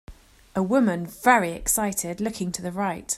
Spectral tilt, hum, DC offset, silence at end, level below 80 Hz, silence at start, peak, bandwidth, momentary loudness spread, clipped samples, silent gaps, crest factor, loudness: -4 dB/octave; none; under 0.1%; 0 s; -48 dBFS; 0.1 s; -2 dBFS; 16 kHz; 10 LU; under 0.1%; none; 22 dB; -24 LUFS